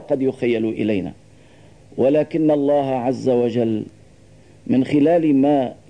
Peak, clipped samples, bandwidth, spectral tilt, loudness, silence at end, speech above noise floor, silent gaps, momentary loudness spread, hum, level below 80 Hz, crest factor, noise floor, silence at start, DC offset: -8 dBFS; under 0.1%; 9.6 kHz; -8.5 dB/octave; -19 LUFS; 0.15 s; 30 dB; none; 10 LU; none; -58 dBFS; 12 dB; -48 dBFS; 0 s; 0.2%